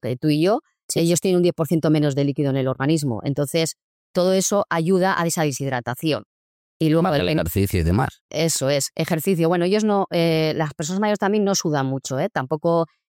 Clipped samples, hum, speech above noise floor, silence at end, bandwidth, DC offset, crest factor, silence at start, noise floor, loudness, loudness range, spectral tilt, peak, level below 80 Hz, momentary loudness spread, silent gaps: under 0.1%; none; over 70 dB; 0.25 s; 17 kHz; under 0.1%; 12 dB; 0.05 s; under -90 dBFS; -21 LUFS; 1 LU; -5 dB/octave; -10 dBFS; -44 dBFS; 6 LU; 0.83-0.89 s, 3.84-4.14 s, 6.26-6.80 s, 8.21-8.29 s